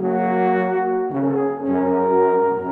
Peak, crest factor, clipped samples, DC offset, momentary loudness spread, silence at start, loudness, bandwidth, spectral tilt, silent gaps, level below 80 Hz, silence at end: -6 dBFS; 12 dB; under 0.1%; under 0.1%; 4 LU; 0 s; -19 LUFS; 4.3 kHz; -10.5 dB/octave; none; -66 dBFS; 0 s